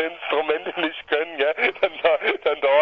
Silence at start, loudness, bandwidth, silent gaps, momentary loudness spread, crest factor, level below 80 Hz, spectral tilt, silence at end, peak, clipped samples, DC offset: 0 s; -22 LUFS; 5.8 kHz; none; 5 LU; 16 dB; -64 dBFS; -5 dB/octave; 0 s; -6 dBFS; under 0.1%; under 0.1%